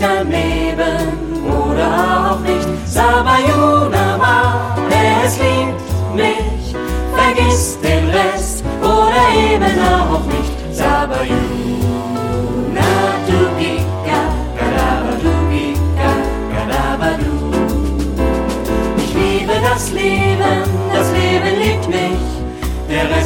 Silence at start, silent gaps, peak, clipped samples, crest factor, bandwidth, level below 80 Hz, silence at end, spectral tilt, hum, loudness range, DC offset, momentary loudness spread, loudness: 0 s; none; -2 dBFS; under 0.1%; 14 dB; 17 kHz; -24 dBFS; 0 s; -5.5 dB/octave; none; 4 LU; under 0.1%; 7 LU; -15 LUFS